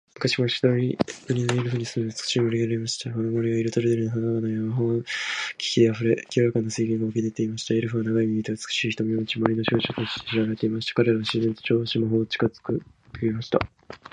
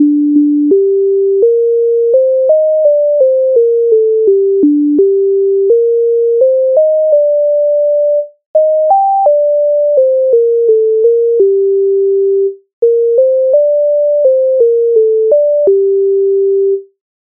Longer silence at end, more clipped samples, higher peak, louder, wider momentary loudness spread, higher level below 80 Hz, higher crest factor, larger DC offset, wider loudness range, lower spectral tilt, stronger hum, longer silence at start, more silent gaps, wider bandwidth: second, 0.15 s vs 0.4 s; neither; about the same, -2 dBFS vs 0 dBFS; second, -25 LUFS vs -10 LUFS; first, 6 LU vs 2 LU; first, -58 dBFS vs -68 dBFS; first, 22 dB vs 8 dB; neither; about the same, 1 LU vs 1 LU; about the same, -5.5 dB/octave vs -6.5 dB/octave; neither; first, 0.2 s vs 0 s; second, none vs 8.46-8.54 s, 12.73-12.82 s; first, 10.5 kHz vs 1.1 kHz